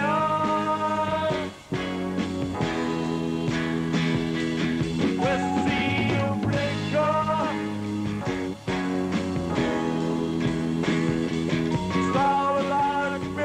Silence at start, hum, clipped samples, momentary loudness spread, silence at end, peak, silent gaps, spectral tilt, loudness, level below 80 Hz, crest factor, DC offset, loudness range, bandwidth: 0 s; none; under 0.1%; 5 LU; 0 s; -12 dBFS; none; -6.5 dB/octave; -25 LUFS; -48 dBFS; 14 dB; under 0.1%; 3 LU; 12.5 kHz